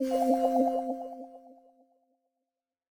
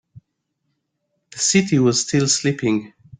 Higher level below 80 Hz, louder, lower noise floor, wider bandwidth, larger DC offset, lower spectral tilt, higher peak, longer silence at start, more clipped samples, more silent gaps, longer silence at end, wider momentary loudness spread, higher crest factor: second, -76 dBFS vs -58 dBFS; second, -28 LUFS vs -18 LUFS; first, -89 dBFS vs -74 dBFS; first, 20 kHz vs 10 kHz; neither; about the same, -5 dB/octave vs -4 dB/octave; second, -14 dBFS vs -2 dBFS; second, 0 s vs 0.15 s; neither; neither; first, 1.35 s vs 0.3 s; first, 19 LU vs 7 LU; about the same, 18 dB vs 20 dB